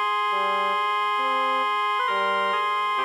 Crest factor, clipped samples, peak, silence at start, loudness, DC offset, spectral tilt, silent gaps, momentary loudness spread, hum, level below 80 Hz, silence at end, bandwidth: 10 dB; under 0.1%; -12 dBFS; 0 s; -23 LUFS; under 0.1%; -2 dB/octave; none; 1 LU; none; -86 dBFS; 0 s; 16 kHz